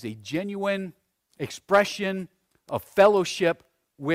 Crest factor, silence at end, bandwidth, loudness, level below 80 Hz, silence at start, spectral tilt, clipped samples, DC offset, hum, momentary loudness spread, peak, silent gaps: 20 dB; 0 s; 16 kHz; -25 LUFS; -64 dBFS; 0 s; -5 dB/octave; under 0.1%; under 0.1%; none; 16 LU; -6 dBFS; none